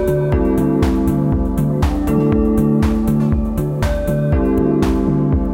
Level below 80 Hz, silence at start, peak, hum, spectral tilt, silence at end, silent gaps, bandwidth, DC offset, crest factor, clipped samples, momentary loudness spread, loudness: -22 dBFS; 0 s; -2 dBFS; none; -8.5 dB/octave; 0 s; none; 16.5 kHz; under 0.1%; 12 dB; under 0.1%; 3 LU; -16 LUFS